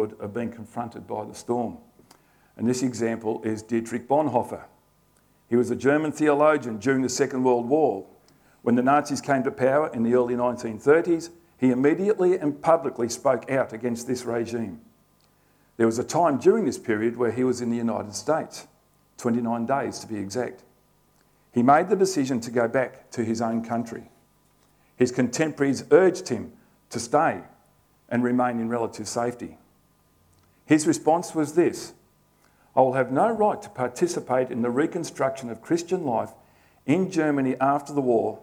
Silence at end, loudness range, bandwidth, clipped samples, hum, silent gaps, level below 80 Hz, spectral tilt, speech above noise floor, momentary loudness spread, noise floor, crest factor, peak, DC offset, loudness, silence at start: 0 s; 5 LU; 19 kHz; under 0.1%; 50 Hz at -65 dBFS; none; -66 dBFS; -5.5 dB/octave; 39 dB; 12 LU; -62 dBFS; 20 dB; -4 dBFS; under 0.1%; -24 LUFS; 0 s